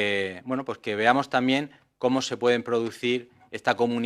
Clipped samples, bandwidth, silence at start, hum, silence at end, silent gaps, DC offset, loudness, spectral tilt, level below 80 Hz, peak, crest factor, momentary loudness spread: under 0.1%; 13 kHz; 0 s; none; 0 s; none; under 0.1%; -26 LUFS; -4.5 dB/octave; -72 dBFS; -6 dBFS; 20 dB; 9 LU